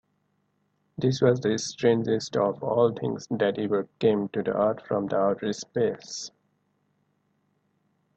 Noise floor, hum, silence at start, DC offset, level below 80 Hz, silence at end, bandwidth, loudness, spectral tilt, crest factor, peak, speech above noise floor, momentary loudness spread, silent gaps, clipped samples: -72 dBFS; 50 Hz at -50 dBFS; 1 s; under 0.1%; -66 dBFS; 1.9 s; 8.6 kHz; -26 LUFS; -6 dB/octave; 20 dB; -6 dBFS; 47 dB; 8 LU; none; under 0.1%